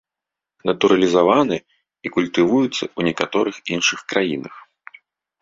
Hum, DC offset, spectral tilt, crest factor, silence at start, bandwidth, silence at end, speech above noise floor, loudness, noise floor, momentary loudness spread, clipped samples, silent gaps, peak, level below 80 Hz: none; under 0.1%; -4.5 dB/octave; 20 dB; 0.65 s; 7.8 kHz; 0.8 s; 68 dB; -19 LUFS; -86 dBFS; 12 LU; under 0.1%; none; 0 dBFS; -60 dBFS